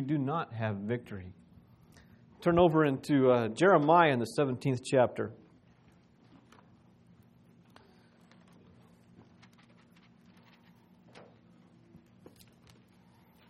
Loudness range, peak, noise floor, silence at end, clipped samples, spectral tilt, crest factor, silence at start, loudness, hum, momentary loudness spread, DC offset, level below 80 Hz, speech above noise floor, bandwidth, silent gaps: 10 LU; -10 dBFS; -62 dBFS; 8.15 s; under 0.1%; -7 dB/octave; 24 dB; 0 s; -28 LUFS; none; 15 LU; under 0.1%; -66 dBFS; 35 dB; 13 kHz; none